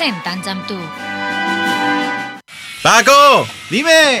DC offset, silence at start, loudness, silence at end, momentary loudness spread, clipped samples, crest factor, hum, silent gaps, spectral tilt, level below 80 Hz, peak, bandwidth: under 0.1%; 0 s; -13 LUFS; 0 s; 17 LU; 0.3%; 14 dB; none; none; -2.5 dB/octave; -58 dBFS; 0 dBFS; over 20 kHz